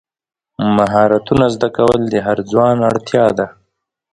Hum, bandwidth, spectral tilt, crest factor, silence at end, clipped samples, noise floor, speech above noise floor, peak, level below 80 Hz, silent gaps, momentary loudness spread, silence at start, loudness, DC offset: none; 11.5 kHz; -7 dB/octave; 14 dB; 0.65 s; under 0.1%; -69 dBFS; 55 dB; 0 dBFS; -44 dBFS; none; 5 LU; 0.6 s; -14 LUFS; under 0.1%